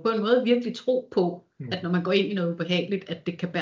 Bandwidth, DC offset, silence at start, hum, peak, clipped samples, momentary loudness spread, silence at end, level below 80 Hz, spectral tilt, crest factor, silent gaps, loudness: 7.6 kHz; under 0.1%; 0 s; none; -8 dBFS; under 0.1%; 9 LU; 0 s; -70 dBFS; -7 dB/octave; 18 dB; none; -26 LUFS